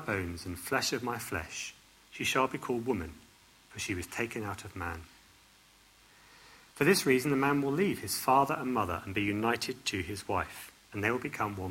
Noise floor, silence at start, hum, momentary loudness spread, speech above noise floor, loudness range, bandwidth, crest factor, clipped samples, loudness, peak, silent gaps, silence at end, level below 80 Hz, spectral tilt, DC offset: -61 dBFS; 0 s; none; 13 LU; 30 dB; 10 LU; 16.5 kHz; 22 dB; under 0.1%; -32 LUFS; -12 dBFS; none; 0 s; -62 dBFS; -4 dB/octave; under 0.1%